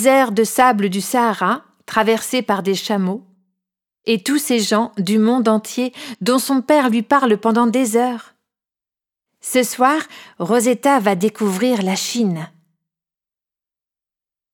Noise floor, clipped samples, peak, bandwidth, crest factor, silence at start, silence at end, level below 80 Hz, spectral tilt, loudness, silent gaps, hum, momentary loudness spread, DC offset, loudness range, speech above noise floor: -90 dBFS; under 0.1%; 0 dBFS; 18.5 kHz; 18 dB; 0 s; 2.05 s; -68 dBFS; -4.5 dB/octave; -17 LUFS; none; none; 9 LU; under 0.1%; 3 LU; 73 dB